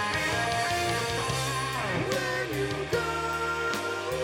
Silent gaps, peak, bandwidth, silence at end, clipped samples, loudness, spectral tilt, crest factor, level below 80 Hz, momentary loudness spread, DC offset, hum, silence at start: none; -14 dBFS; 19 kHz; 0 s; under 0.1%; -28 LUFS; -3.5 dB/octave; 16 dB; -50 dBFS; 3 LU; under 0.1%; none; 0 s